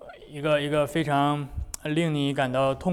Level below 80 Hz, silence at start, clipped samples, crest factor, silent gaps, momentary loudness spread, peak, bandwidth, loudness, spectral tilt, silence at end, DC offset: -44 dBFS; 0 s; under 0.1%; 14 dB; none; 9 LU; -12 dBFS; 16.5 kHz; -26 LUFS; -6 dB/octave; 0 s; under 0.1%